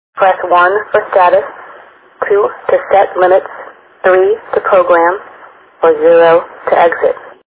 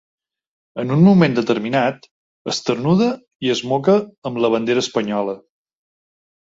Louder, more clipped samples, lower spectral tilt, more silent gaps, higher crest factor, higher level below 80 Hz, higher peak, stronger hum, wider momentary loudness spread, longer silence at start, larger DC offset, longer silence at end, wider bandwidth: first, -10 LUFS vs -18 LUFS; first, 0.3% vs under 0.1%; first, -8 dB/octave vs -6.5 dB/octave; second, none vs 2.11-2.45 s, 3.35-3.40 s, 4.18-4.22 s; second, 10 dB vs 16 dB; first, -54 dBFS vs -60 dBFS; about the same, 0 dBFS vs -2 dBFS; neither; second, 8 LU vs 14 LU; second, 0.15 s vs 0.75 s; neither; second, 0.15 s vs 1.2 s; second, 4 kHz vs 7.8 kHz